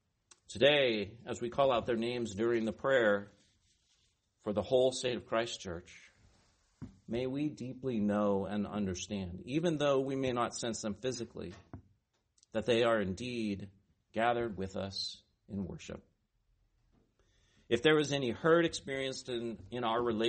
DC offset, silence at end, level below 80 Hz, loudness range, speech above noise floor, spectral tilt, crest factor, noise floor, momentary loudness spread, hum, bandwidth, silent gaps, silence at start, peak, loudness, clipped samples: under 0.1%; 0 s; -64 dBFS; 6 LU; 43 dB; -5 dB/octave; 22 dB; -76 dBFS; 15 LU; none; 8.4 kHz; none; 0.5 s; -12 dBFS; -34 LUFS; under 0.1%